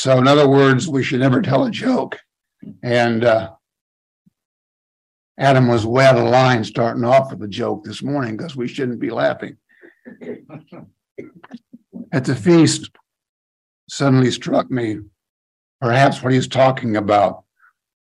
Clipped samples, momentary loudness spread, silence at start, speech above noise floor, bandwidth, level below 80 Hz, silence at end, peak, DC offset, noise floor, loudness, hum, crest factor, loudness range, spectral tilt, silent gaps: under 0.1%; 16 LU; 0 s; 42 dB; 11 kHz; -60 dBFS; 0.7 s; 0 dBFS; under 0.1%; -58 dBFS; -16 LUFS; none; 18 dB; 9 LU; -6 dB/octave; 3.81-4.25 s, 4.45-5.35 s, 11.11-11.16 s, 13.29-13.87 s, 15.29-15.79 s